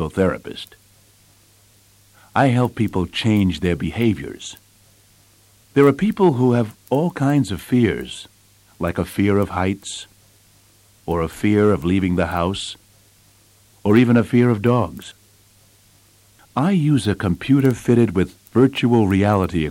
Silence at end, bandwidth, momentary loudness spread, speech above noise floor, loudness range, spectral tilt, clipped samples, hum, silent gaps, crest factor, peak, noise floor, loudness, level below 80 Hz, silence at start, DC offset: 0 s; 16.5 kHz; 15 LU; 36 dB; 4 LU; -7 dB/octave; under 0.1%; none; none; 16 dB; -4 dBFS; -53 dBFS; -19 LUFS; -46 dBFS; 0 s; under 0.1%